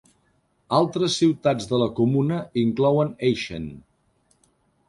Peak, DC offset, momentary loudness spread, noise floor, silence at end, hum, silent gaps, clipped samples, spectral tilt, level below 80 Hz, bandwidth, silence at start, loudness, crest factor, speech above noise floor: -6 dBFS; under 0.1%; 7 LU; -66 dBFS; 1.1 s; none; none; under 0.1%; -6 dB/octave; -56 dBFS; 11.5 kHz; 0.7 s; -22 LUFS; 18 dB; 44 dB